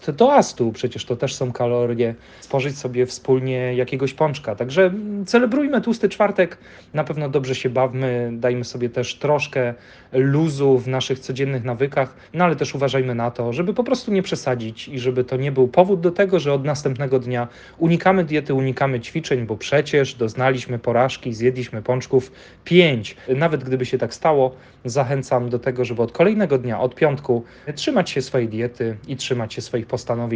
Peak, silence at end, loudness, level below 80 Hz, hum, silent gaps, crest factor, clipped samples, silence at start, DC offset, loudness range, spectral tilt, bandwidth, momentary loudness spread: 0 dBFS; 0 s; -20 LUFS; -56 dBFS; none; none; 20 dB; under 0.1%; 0 s; under 0.1%; 2 LU; -6 dB/octave; 9.6 kHz; 8 LU